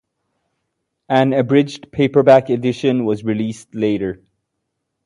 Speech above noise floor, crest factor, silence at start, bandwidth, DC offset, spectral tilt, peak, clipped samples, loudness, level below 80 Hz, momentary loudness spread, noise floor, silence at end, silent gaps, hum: 60 dB; 18 dB; 1.1 s; 11 kHz; under 0.1%; -7 dB/octave; 0 dBFS; under 0.1%; -17 LUFS; -54 dBFS; 11 LU; -75 dBFS; 0.9 s; none; none